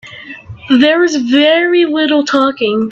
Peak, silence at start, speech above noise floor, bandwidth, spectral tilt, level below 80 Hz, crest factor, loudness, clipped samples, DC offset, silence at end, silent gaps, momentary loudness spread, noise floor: 0 dBFS; 0.05 s; 20 dB; 7.6 kHz; -4 dB/octave; -54 dBFS; 12 dB; -11 LUFS; under 0.1%; under 0.1%; 0 s; none; 20 LU; -31 dBFS